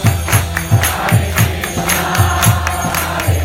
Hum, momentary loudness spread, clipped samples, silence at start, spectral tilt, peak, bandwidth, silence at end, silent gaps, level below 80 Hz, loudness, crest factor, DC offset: none; 4 LU; under 0.1%; 0 s; -4 dB/octave; 0 dBFS; 17.5 kHz; 0 s; none; -26 dBFS; -14 LUFS; 14 dB; under 0.1%